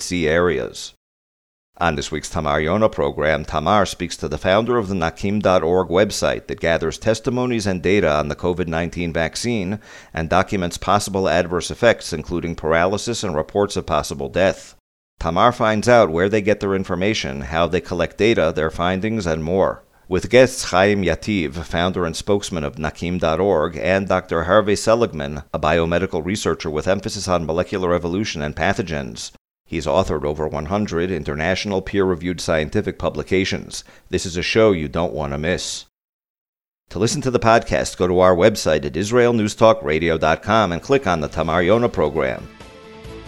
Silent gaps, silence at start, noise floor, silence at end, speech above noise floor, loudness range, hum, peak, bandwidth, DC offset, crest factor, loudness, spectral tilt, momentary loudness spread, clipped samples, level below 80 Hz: 0.97-1.73 s, 14.80-15.17 s, 29.40-29.45 s, 29.60-29.65 s, 36.04-36.19 s, 36.30-36.53 s; 0 s; -40 dBFS; 0 s; 21 dB; 4 LU; none; 0 dBFS; 14.5 kHz; under 0.1%; 20 dB; -19 LUFS; -5 dB/octave; 9 LU; under 0.1%; -40 dBFS